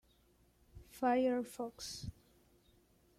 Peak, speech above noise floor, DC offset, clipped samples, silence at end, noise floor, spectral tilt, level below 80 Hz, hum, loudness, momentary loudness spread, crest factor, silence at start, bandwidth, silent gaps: -22 dBFS; 34 dB; under 0.1%; under 0.1%; 1.1 s; -71 dBFS; -5 dB/octave; -64 dBFS; none; -38 LUFS; 17 LU; 18 dB; 0.75 s; 15.5 kHz; none